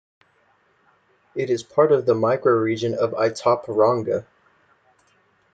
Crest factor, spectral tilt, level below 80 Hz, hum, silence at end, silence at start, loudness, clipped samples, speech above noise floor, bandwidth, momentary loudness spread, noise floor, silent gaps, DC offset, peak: 18 dB; -6.5 dB/octave; -68 dBFS; none; 1.3 s; 1.35 s; -21 LUFS; under 0.1%; 42 dB; 9 kHz; 9 LU; -62 dBFS; none; under 0.1%; -4 dBFS